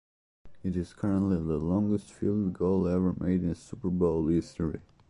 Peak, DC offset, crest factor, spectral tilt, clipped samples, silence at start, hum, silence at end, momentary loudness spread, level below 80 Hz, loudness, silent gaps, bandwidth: -14 dBFS; under 0.1%; 14 dB; -9.5 dB/octave; under 0.1%; 0.45 s; none; 0.3 s; 8 LU; -46 dBFS; -29 LUFS; none; 11 kHz